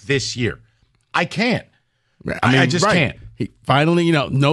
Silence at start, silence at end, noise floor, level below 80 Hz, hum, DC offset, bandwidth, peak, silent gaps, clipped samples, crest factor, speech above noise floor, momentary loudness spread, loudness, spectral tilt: 0.05 s; 0 s; -64 dBFS; -48 dBFS; none; under 0.1%; 12 kHz; -2 dBFS; none; under 0.1%; 16 dB; 46 dB; 14 LU; -18 LUFS; -5.5 dB/octave